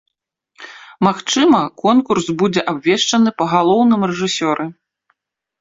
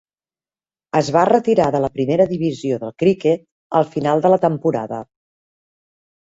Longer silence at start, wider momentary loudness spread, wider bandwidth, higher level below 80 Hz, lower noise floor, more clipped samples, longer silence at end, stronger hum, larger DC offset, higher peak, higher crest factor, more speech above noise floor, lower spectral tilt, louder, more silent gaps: second, 0.6 s vs 0.95 s; about the same, 9 LU vs 9 LU; about the same, 7.8 kHz vs 8 kHz; about the same, -56 dBFS vs -56 dBFS; second, -73 dBFS vs under -90 dBFS; neither; second, 0.9 s vs 1.25 s; neither; neither; about the same, 0 dBFS vs -2 dBFS; about the same, 16 dB vs 18 dB; second, 58 dB vs over 73 dB; second, -4.5 dB/octave vs -7 dB/octave; first, -15 LUFS vs -18 LUFS; second, none vs 3.52-3.70 s